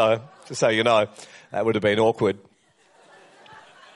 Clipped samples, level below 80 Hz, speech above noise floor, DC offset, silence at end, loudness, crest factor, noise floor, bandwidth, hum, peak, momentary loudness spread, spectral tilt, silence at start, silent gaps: under 0.1%; -66 dBFS; 38 dB; under 0.1%; 1.6 s; -22 LUFS; 18 dB; -59 dBFS; 11.5 kHz; none; -6 dBFS; 15 LU; -4.5 dB/octave; 0 s; none